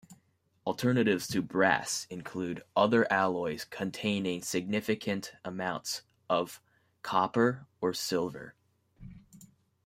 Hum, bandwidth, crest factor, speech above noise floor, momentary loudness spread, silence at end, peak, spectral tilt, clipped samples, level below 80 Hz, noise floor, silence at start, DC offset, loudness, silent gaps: none; 16 kHz; 22 dB; 40 dB; 13 LU; 0.4 s; -10 dBFS; -4.5 dB/octave; under 0.1%; -68 dBFS; -70 dBFS; 0.1 s; under 0.1%; -31 LUFS; none